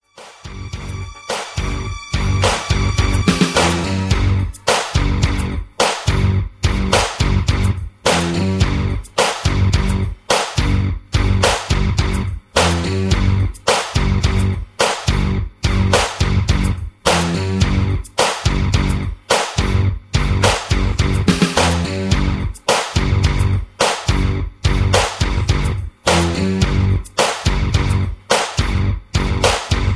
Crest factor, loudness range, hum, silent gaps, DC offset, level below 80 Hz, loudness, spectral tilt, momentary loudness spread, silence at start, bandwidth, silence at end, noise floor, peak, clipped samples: 16 dB; 1 LU; none; none; under 0.1%; -22 dBFS; -17 LUFS; -4.5 dB/octave; 6 LU; 0.2 s; 11 kHz; 0 s; -37 dBFS; 0 dBFS; under 0.1%